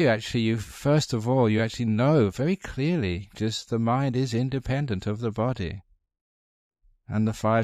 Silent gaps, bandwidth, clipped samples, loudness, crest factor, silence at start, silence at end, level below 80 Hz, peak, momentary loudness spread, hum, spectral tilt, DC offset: 6.21-6.71 s; 14.5 kHz; under 0.1%; -26 LUFS; 16 dB; 0 s; 0 s; -50 dBFS; -10 dBFS; 8 LU; none; -6.5 dB/octave; under 0.1%